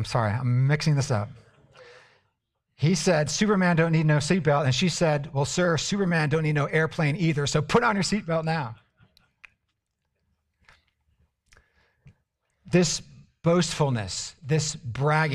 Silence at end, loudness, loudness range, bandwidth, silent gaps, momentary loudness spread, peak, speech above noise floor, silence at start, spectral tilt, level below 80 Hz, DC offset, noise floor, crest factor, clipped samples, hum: 0 s; -24 LUFS; 8 LU; 11.5 kHz; none; 7 LU; -6 dBFS; 55 dB; 0 s; -5 dB/octave; -54 dBFS; under 0.1%; -79 dBFS; 20 dB; under 0.1%; none